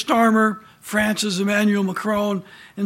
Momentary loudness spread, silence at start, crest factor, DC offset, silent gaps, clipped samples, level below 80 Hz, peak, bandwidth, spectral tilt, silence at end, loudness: 11 LU; 0 s; 16 dB; under 0.1%; none; under 0.1%; -56 dBFS; -4 dBFS; 16.5 kHz; -4.5 dB/octave; 0 s; -20 LUFS